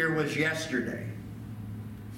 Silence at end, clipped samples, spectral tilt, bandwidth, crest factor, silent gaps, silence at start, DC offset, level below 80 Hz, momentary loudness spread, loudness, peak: 0 s; under 0.1%; -5 dB/octave; 17 kHz; 18 dB; none; 0 s; under 0.1%; -56 dBFS; 14 LU; -32 LUFS; -14 dBFS